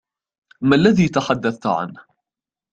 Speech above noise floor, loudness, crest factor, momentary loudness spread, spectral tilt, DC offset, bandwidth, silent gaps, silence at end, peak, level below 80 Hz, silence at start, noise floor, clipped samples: 72 dB; -18 LUFS; 18 dB; 10 LU; -6.5 dB/octave; under 0.1%; 8.4 kHz; none; 0.75 s; -2 dBFS; -52 dBFS; 0.6 s; -89 dBFS; under 0.1%